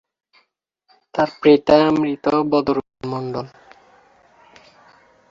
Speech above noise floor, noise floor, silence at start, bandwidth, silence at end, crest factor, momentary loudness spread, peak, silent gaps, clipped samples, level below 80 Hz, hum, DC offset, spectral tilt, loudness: 51 dB; -68 dBFS; 1.15 s; 7.4 kHz; 1.85 s; 20 dB; 15 LU; -2 dBFS; none; under 0.1%; -56 dBFS; none; under 0.1%; -7 dB/octave; -18 LUFS